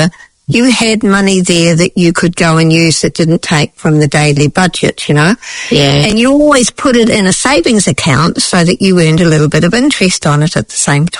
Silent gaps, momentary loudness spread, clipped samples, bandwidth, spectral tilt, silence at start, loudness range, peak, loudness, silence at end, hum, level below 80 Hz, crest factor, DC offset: none; 4 LU; 0.5%; 11 kHz; -4.5 dB/octave; 0 s; 1 LU; 0 dBFS; -9 LUFS; 0 s; none; -36 dBFS; 8 dB; under 0.1%